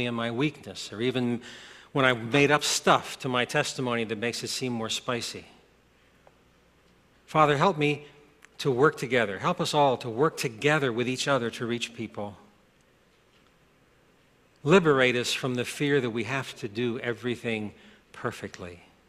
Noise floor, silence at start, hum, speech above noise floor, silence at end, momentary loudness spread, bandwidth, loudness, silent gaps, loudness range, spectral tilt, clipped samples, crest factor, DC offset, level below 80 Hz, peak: -62 dBFS; 0 s; none; 36 dB; 0.35 s; 14 LU; 14.5 kHz; -27 LUFS; none; 7 LU; -4.5 dB/octave; under 0.1%; 22 dB; under 0.1%; -64 dBFS; -6 dBFS